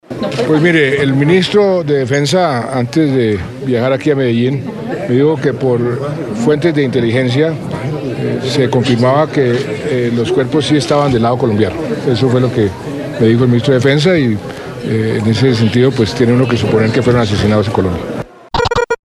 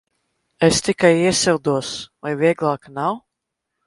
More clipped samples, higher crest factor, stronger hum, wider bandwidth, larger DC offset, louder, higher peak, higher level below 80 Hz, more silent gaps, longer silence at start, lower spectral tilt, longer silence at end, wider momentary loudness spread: neither; second, 12 dB vs 20 dB; neither; about the same, 12.5 kHz vs 11.5 kHz; neither; first, -13 LUFS vs -19 LUFS; about the same, 0 dBFS vs 0 dBFS; first, -40 dBFS vs -52 dBFS; neither; second, 0.1 s vs 0.6 s; first, -6.5 dB/octave vs -4 dB/octave; second, 0.15 s vs 0.7 s; second, 8 LU vs 12 LU